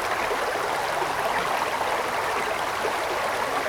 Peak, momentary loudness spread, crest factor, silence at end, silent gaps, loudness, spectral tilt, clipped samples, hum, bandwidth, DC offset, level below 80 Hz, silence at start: -12 dBFS; 1 LU; 14 dB; 0 s; none; -25 LUFS; -2.5 dB/octave; under 0.1%; none; over 20 kHz; under 0.1%; -54 dBFS; 0 s